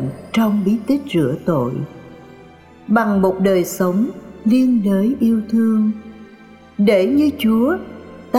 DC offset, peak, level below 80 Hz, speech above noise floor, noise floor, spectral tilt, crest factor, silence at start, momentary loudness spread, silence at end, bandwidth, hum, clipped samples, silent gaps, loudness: under 0.1%; -4 dBFS; -52 dBFS; 27 dB; -43 dBFS; -7 dB/octave; 14 dB; 0 s; 9 LU; 0 s; 15.5 kHz; none; under 0.1%; none; -17 LUFS